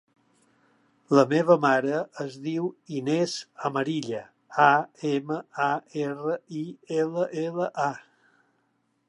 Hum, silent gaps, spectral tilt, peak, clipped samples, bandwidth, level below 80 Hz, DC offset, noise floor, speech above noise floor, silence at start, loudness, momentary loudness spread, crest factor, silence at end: none; none; -6 dB/octave; -6 dBFS; under 0.1%; 11 kHz; -80 dBFS; under 0.1%; -72 dBFS; 46 dB; 1.1 s; -26 LUFS; 13 LU; 22 dB; 1.1 s